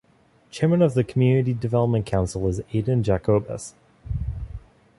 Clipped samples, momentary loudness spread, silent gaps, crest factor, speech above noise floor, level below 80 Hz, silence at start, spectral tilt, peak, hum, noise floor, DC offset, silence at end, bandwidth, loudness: under 0.1%; 16 LU; none; 16 dB; 37 dB; -40 dBFS; 0.55 s; -8 dB/octave; -6 dBFS; none; -59 dBFS; under 0.1%; 0.4 s; 11.5 kHz; -23 LUFS